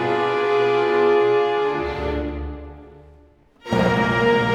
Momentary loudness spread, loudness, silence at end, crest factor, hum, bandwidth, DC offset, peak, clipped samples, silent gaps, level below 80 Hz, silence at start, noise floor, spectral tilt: 16 LU; -20 LUFS; 0 s; 14 dB; none; 9 kHz; under 0.1%; -6 dBFS; under 0.1%; none; -38 dBFS; 0 s; -52 dBFS; -6.5 dB/octave